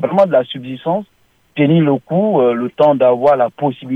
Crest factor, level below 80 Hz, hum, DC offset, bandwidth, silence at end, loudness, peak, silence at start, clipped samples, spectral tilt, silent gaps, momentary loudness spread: 12 dB; -62 dBFS; none; under 0.1%; 5.4 kHz; 0 s; -14 LUFS; -2 dBFS; 0 s; under 0.1%; -9 dB/octave; none; 10 LU